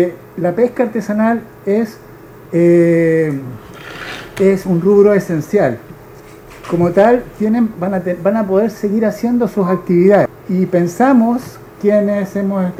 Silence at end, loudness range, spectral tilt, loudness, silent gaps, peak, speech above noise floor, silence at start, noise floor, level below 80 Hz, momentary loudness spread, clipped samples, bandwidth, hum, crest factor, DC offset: 0 s; 2 LU; -8 dB/octave; -14 LUFS; none; 0 dBFS; 23 dB; 0 s; -37 dBFS; -48 dBFS; 12 LU; under 0.1%; 15 kHz; none; 14 dB; under 0.1%